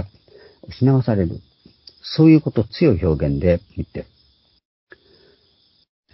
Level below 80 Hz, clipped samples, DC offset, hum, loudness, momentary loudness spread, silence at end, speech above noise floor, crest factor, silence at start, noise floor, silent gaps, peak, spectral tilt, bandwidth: -36 dBFS; under 0.1%; under 0.1%; none; -18 LUFS; 22 LU; 2.1 s; 43 dB; 18 dB; 0 s; -60 dBFS; none; -2 dBFS; -12 dB/octave; 5.8 kHz